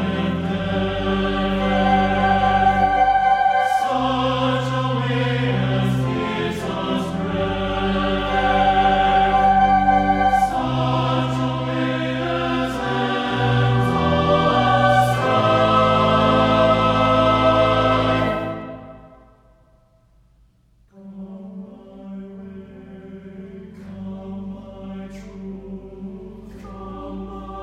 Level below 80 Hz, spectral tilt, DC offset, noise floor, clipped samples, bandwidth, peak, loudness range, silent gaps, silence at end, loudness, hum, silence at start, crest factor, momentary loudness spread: -38 dBFS; -6.5 dB/octave; under 0.1%; -56 dBFS; under 0.1%; 13.5 kHz; -4 dBFS; 20 LU; none; 0 s; -18 LUFS; none; 0 s; 16 dB; 21 LU